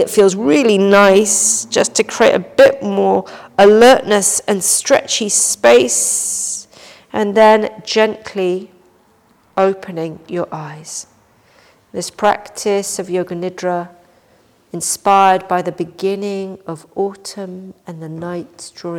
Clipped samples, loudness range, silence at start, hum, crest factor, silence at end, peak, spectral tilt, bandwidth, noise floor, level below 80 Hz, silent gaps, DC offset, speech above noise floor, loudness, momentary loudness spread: under 0.1%; 11 LU; 0 s; none; 14 dB; 0 s; -2 dBFS; -3 dB/octave; 19 kHz; -53 dBFS; -56 dBFS; none; under 0.1%; 39 dB; -14 LUFS; 18 LU